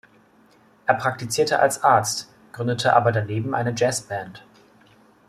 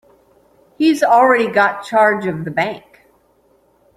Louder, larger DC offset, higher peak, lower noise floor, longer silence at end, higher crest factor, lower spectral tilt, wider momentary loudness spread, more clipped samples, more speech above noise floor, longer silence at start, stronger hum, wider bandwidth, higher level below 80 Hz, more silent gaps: second, -22 LUFS vs -15 LUFS; neither; about the same, -2 dBFS vs -2 dBFS; about the same, -56 dBFS vs -56 dBFS; second, 0.9 s vs 1.2 s; about the same, 20 dB vs 16 dB; second, -4 dB/octave vs -5.5 dB/octave; about the same, 12 LU vs 10 LU; neither; second, 34 dB vs 42 dB; about the same, 0.85 s vs 0.8 s; neither; about the same, 14.5 kHz vs 15 kHz; about the same, -62 dBFS vs -60 dBFS; neither